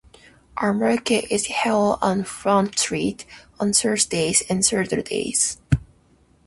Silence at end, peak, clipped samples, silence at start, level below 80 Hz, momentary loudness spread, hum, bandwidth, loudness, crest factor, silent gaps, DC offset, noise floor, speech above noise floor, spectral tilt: 0.65 s; -4 dBFS; under 0.1%; 0.55 s; -44 dBFS; 7 LU; none; 12 kHz; -21 LUFS; 20 dB; none; under 0.1%; -57 dBFS; 36 dB; -3.5 dB/octave